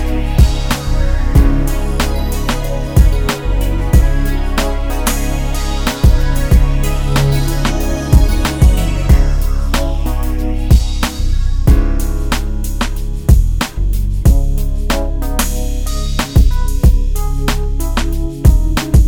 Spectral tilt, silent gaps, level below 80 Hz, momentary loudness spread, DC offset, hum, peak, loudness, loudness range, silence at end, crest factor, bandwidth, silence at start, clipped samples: -5.5 dB/octave; none; -12 dBFS; 6 LU; under 0.1%; none; 0 dBFS; -16 LUFS; 2 LU; 0 s; 12 dB; 18 kHz; 0 s; under 0.1%